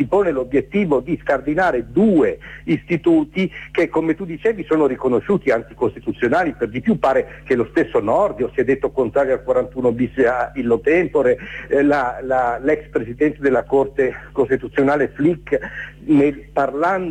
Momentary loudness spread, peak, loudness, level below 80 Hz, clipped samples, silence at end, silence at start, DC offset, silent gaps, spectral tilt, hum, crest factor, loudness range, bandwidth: 6 LU; -6 dBFS; -19 LUFS; -44 dBFS; under 0.1%; 0 s; 0 s; under 0.1%; none; -8 dB/octave; none; 12 dB; 1 LU; 9 kHz